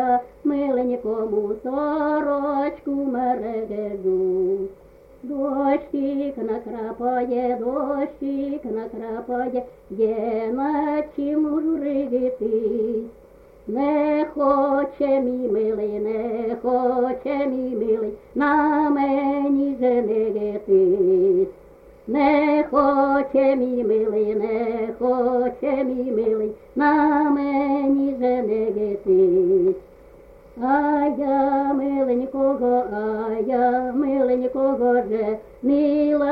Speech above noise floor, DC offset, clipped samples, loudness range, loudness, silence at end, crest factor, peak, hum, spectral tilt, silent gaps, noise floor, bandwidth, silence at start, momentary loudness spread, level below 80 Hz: 26 dB; under 0.1%; under 0.1%; 5 LU; -22 LUFS; 0 s; 16 dB; -6 dBFS; none; -9 dB/octave; none; -46 dBFS; 5 kHz; 0 s; 8 LU; -54 dBFS